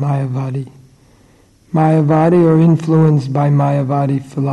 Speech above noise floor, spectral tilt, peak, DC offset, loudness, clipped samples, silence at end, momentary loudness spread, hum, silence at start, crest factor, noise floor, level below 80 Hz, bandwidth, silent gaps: 36 dB; -9.5 dB/octave; -4 dBFS; under 0.1%; -13 LUFS; under 0.1%; 0 s; 10 LU; none; 0 s; 10 dB; -49 dBFS; -52 dBFS; 9.2 kHz; none